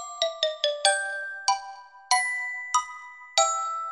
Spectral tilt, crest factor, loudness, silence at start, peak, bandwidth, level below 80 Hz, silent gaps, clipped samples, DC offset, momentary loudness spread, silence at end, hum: 4 dB/octave; 24 dB; -26 LUFS; 0 s; -4 dBFS; 14.5 kHz; -78 dBFS; none; under 0.1%; under 0.1%; 8 LU; 0 s; none